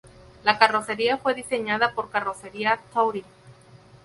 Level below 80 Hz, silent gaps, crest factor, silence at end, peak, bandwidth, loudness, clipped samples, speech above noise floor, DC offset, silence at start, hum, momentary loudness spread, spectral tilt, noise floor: -60 dBFS; none; 24 dB; 0.3 s; 0 dBFS; 11.5 kHz; -24 LUFS; under 0.1%; 27 dB; under 0.1%; 0.05 s; none; 8 LU; -3.5 dB/octave; -51 dBFS